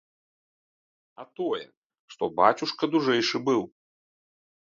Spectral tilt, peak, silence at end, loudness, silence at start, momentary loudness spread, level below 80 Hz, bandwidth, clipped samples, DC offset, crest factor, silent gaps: -4.5 dB/octave; -4 dBFS; 1 s; -26 LUFS; 1.2 s; 12 LU; -72 dBFS; 7.6 kHz; under 0.1%; under 0.1%; 24 dB; 1.77-1.90 s, 1.99-2.08 s